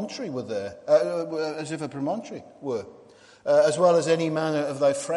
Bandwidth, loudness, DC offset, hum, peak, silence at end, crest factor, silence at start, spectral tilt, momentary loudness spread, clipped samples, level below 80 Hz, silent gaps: 11.5 kHz; -25 LUFS; under 0.1%; none; -8 dBFS; 0 s; 16 dB; 0 s; -5 dB/octave; 13 LU; under 0.1%; -72 dBFS; none